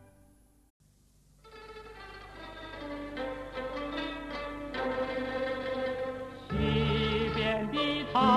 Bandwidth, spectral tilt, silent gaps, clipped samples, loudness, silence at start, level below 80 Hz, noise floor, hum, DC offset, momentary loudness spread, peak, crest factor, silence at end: 13 kHz; -6.5 dB/octave; 0.70-0.80 s; under 0.1%; -33 LUFS; 0 s; -48 dBFS; -63 dBFS; none; under 0.1%; 18 LU; -12 dBFS; 22 dB; 0 s